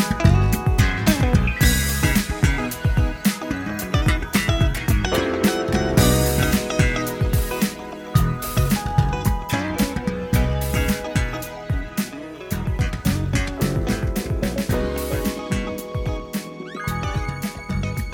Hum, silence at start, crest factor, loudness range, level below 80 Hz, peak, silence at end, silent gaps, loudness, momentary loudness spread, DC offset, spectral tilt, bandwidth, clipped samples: none; 0 s; 18 dB; 5 LU; -26 dBFS; -2 dBFS; 0 s; none; -22 LUFS; 10 LU; under 0.1%; -5.5 dB/octave; 17 kHz; under 0.1%